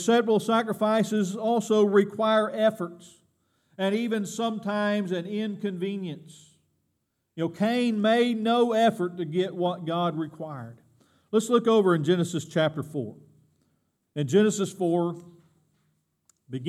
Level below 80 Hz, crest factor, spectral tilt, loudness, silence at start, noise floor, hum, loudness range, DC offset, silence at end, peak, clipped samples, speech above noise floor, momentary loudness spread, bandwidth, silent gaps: -80 dBFS; 18 dB; -5.5 dB/octave; -25 LUFS; 0 s; -77 dBFS; none; 5 LU; under 0.1%; 0 s; -8 dBFS; under 0.1%; 52 dB; 14 LU; 14 kHz; none